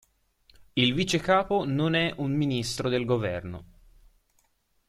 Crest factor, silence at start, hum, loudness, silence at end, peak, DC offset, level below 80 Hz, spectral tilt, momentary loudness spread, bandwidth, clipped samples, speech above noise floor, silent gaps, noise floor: 20 dB; 0.75 s; none; -26 LUFS; 1.25 s; -8 dBFS; under 0.1%; -54 dBFS; -5 dB/octave; 9 LU; 14.5 kHz; under 0.1%; 44 dB; none; -70 dBFS